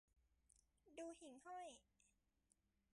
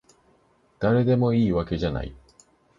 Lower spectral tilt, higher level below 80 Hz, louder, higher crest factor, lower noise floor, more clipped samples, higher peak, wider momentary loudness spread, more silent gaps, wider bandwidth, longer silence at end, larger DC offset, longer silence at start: second, -3 dB/octave vs -9 dB/octave; second, -86 dBFS vs -42 dBFS; second, -58 LUFS vs -23 LUFS; about the same, 18 dB vs 16 dB; first, -85 dBFS vs -62 dBFS; neither; second, -44 dBFS vs -8 dBFS; second, 8 LU vs 11 LU; neither; first, 11 kHz vs 7.6 kHz; first, 0.85 s vs 0.65 s; neither; second, 0.15 s vs 0.8 s